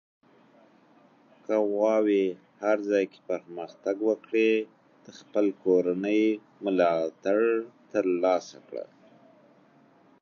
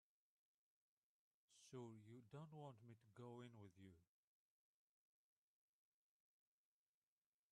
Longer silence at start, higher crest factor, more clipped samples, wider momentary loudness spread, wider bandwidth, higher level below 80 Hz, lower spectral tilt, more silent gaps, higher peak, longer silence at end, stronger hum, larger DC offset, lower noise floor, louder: about the same, 1.5 s vs 1.5 s; about the same, 20 dB vs 20 dB; neither; first, 14 LU vs 8 LU; second, 7 kHz vs 9.6 kHz; first, -84 dBFS vs under -90 dBFS; about the same, -6 dB/octave vs -6.5 dB/octave; neither; first, -8 dBFS vs -46 dBFS; second, 1.4 s vs 3.5 s; neither; neither; second, -59 dBFS vs under -90 dBFS; first, -27 LUFS vs -62 LUFS